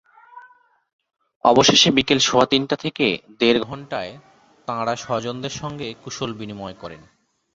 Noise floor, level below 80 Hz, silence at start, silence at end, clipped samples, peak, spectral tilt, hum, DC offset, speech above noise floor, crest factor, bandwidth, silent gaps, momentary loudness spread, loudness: -53 dBFS; -54 dBFS; 0.35 s; 0.55 s; under 0.1%; 0 dBFS; -3.5 dB/octave; none; under 0.1%; 33 dB; 22 dB; 8.2 kHz; 0.93-0.99 s, 1.36-1.40 s; 19 LU; -19 LUFS